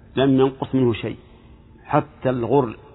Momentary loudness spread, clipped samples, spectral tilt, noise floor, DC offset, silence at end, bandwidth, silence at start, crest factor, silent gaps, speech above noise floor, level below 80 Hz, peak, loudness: 10 LU; under 0.1%; -11.5 dB/octave; -47 dBFS; under 0.1%; 0.2 s; 4.1 kHz; 0.15 s; 20 dB; none; 27 dB; -50 dBFS; -2 dBFS; -21 LUFS